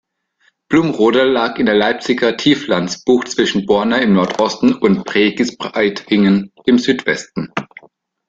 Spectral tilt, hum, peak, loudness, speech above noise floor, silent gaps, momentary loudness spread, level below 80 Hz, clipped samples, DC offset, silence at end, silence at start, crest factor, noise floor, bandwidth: -5 dB/octave; none; 0 dBFS; -15 LUFS; 45 dB; none; 6 LU; -52 dBFS; under 0.1%; under 0.1%; 0.65 s; 0.7 s; 14 dB; -60 dBFS; 7.8 kHz